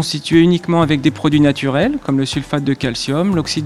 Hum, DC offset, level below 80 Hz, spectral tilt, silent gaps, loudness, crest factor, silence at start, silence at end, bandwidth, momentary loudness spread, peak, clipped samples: none; 0.3%; -42 dBFS; -6 dB/octave; none; -15 LUFS; 14 dB; 0 s; 0 s; 12.5 kHz; 6 LU; 0 dBFS; under 0.1%